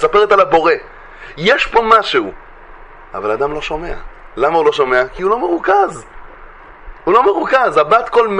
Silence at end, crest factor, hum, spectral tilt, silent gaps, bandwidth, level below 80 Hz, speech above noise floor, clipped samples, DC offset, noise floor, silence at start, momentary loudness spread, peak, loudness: 0 s; 14 dB; none; -4.5 dB/octave; none; 10.5 kHz; -40 dBFS; 23 dB; under 0.1%; under 0.1%; -37 dBFS; 0 s; 17 LU; 0 dBFS; -13 LUFS